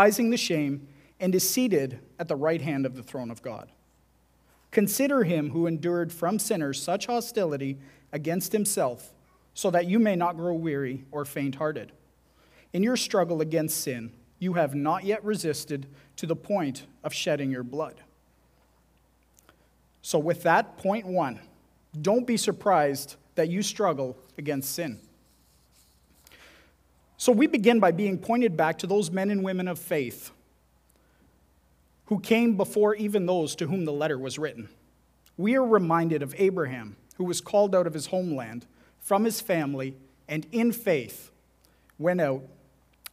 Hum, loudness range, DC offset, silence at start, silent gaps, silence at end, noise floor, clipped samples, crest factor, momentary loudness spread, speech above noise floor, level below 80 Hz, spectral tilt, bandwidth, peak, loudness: none; 6 LU; under 0.1%; 0 s; none; 0.65 s; -64 dBFS; under 0.1%; 22 dB; 14 LU; 38 dB; -66 dBFS; -5 dB/octave; 16 kHz; -4 dBFS; -27 LUFS